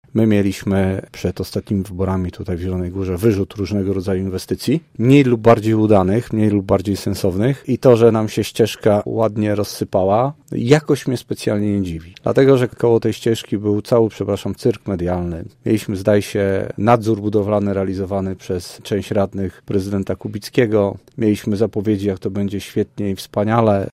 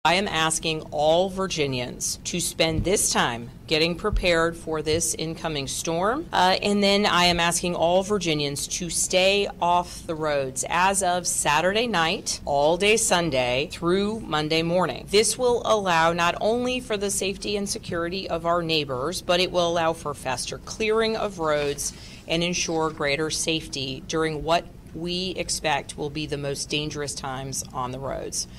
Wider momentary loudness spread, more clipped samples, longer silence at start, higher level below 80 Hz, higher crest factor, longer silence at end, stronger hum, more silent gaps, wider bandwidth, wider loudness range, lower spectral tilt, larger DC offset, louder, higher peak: about the same, 9 LU vs 9 LU; neither; about the same, 0.15 s vs 0.05 s; about the same, -46 dBFS vs -44 dBFS; about the same, 18 dB vs 16 dB; about the same, 0.05 s vs 0 s; neither; neither; about the same, 16 kHz vs 16 kHz; about the same, 5 LU vs 4 LU; first, -7 dB/octave vs -3 dB/octave; neither; first, -18 LUFS vs -24 LUFS; first, 0 dBFS vs -8 dBFS